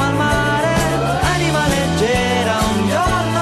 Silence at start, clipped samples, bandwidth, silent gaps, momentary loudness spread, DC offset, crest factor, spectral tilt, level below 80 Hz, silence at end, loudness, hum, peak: 0 s; under 0.1%; 14.5 kHz; none; 1 LU; under 0.1%; 10 dB; -5 dB/octave; -30 dBFS; 0 s; -16 LUFS; none; -6 dBFS